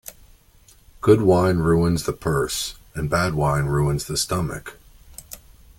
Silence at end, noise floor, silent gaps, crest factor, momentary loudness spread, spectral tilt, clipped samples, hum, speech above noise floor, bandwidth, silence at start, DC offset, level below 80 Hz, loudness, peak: 0.4 s; -53 dBFS; none; 20 dB; 22 LU; -5.5 dB/octave; under 0.1%; none; 33 dB; 17 kHz; 0.05 s; under 0.1%; -40 dBFS; -21 LUFS; -2 dBFS